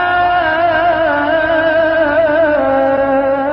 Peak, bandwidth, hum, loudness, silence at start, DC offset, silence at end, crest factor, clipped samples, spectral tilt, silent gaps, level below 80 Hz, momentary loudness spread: -4 dBFS; 5.6 kHz; none; -12 LUFS; 0 s; under 0.1%; 0 s; 10 dB; under 0.1%; -7.5 dB/octave; none; -40 dBFS; 1 LU